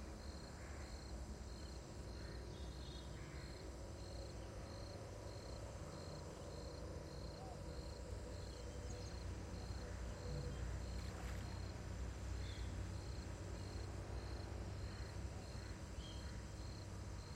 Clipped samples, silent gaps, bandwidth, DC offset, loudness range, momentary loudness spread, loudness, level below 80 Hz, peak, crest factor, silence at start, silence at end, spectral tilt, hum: under 0.1%; none; 15.5 kHz; under 0.1%; 3 LU; 4 LU; -51 LUFS; -52 dBFS; -36 dBFS; 14 dB; 0 s; 0 s; -5.5 dB/octave; none